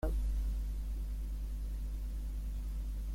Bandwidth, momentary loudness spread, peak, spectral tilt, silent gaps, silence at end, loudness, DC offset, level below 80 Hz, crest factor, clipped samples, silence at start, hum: 15.5 kHz; 5 LU; -22 dBFS; -7 dB/octave; none; 0 s; -41 LUFS; under 0.1%; -36 dBFS; 14 dB; under 0.1%; 0 s; 50 Hz at -40 dBFS